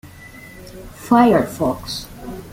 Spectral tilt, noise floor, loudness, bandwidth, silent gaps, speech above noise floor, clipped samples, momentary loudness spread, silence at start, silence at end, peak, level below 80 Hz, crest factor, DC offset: -6 dB/octave; -40 dBFS; -17 LUFS; 16.5 kHz; none; 21 dB; under 0.1%; 25 LU; 0.05 s; 0 s; -2 dBFS; -44 dBFS; 18 dB; under 0.1%